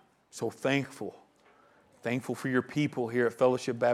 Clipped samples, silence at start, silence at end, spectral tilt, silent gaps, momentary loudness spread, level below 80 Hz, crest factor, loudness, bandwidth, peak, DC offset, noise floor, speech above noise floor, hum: under 0.1%; 0.35 s; 0 s; -6 dB/octave; none; 13 LU; -76 dBFS; 18 dB; -31 LUFS; 14.5 kHz; -14 dBFS; under 0.1%; -62 dBFS; 33 dB; none